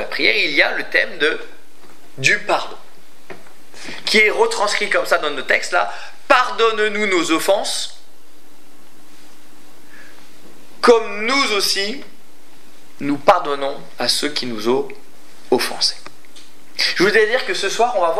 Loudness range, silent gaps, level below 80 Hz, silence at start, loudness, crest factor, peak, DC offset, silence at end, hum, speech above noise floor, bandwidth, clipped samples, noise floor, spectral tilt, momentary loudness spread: 5 LU; none; -64 dBFS; 0 s; -17 LUFS; 20 dB; 0 dBFS; 5%; 0 s; none; 32 dB; 15.5 kHz; under 0.1%; -50 dBFS; -2 dB/octave; 12 LU